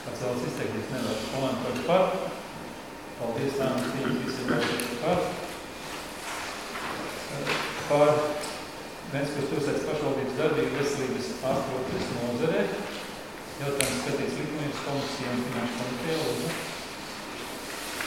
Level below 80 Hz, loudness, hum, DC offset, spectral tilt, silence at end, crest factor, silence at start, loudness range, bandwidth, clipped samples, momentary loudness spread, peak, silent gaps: -56 dBFS; -30 LUFS; none; 0.1%; -4.5 dB/octave; 0 s; 26 dB; 0 s; 3 LU; 18 kHz; under 0.1%; 10 LU; -4 dBFS; none